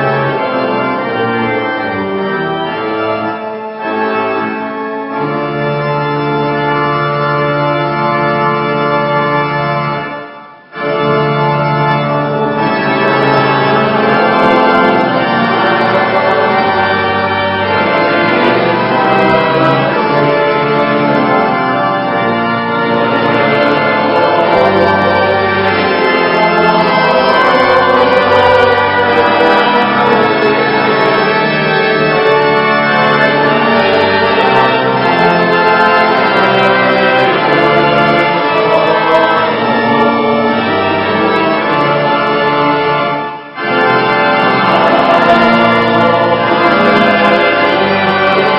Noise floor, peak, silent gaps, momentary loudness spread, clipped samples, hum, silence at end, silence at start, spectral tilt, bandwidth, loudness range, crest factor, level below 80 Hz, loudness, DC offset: -32 dBFS; 0 dBFS; none; 7 LU; 0.2%; none; 0 s; 0 s; -7 dB/octave; 8.6 kHz; 5 LU; 10 dB; -46 dBFS; -10 LUFS; under 0.1%